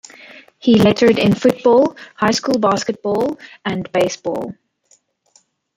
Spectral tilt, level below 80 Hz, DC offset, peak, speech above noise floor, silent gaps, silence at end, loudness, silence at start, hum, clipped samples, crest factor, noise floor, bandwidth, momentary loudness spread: -5.5 dB/octave; -54 dBFS; under 0.1%; 0 dBFS; 42 dB; none; 1.25 s; -16 LUFS; 0.65 s; none; under 0.1%; 16 dB; -58 dBFS; 16 kHz; 12 LU